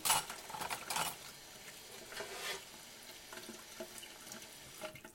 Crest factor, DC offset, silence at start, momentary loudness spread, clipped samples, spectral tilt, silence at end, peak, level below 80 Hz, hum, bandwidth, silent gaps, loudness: 28 dB; under 0.1%; 0 s; 13 LU; under 0.1%; -0.5 dB/octave; 0 s; -16 dBFS; -72 dBFS; none; 17 kHz; none; -43 LUFS